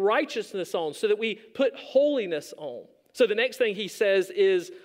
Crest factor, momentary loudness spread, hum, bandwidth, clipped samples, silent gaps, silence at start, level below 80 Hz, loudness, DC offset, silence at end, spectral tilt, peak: 16 dB; 13 LU; none; 16 kHz; under 0.1%; none; 0 s; -82 dBFS; -26 LUFS; under 0.1%; 0.05 s; -4 dB/octave; -10 dBFS